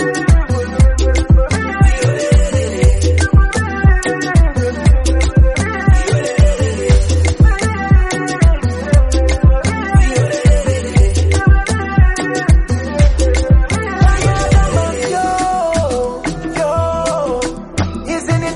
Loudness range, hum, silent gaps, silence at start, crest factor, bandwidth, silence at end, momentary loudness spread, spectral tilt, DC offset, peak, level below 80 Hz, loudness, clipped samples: 2 LU; none; none; 0 s; 12 dB; 11.5 kHz; 0 s; 5 LU; -6 dB/octave; under 0.1%; 0 dBFS; -14 dBFS; -14 LUFS; under 0.1%